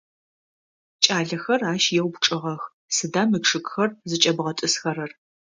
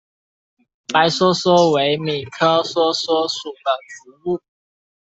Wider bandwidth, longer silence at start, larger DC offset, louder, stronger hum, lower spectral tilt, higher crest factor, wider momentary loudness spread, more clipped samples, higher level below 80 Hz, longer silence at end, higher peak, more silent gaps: first, 10 kHz vs 8.2 kHz; about the same, 1 s vs 0.9 s; neither; second, -22 LUFS vs -18 LUFS; neither; second, -3 dB/octave vs -4.5 dB/octave; first, 24 dB vs 16 dB; about the same, 9 LU vs 11 LU; neither; second, -70 dBFS vs -62 dBFS; second, 0.5 s vs 0.7 s; about the same, 0 dBFS vs -2 dBFS; first, 2.73-2.88 s vs none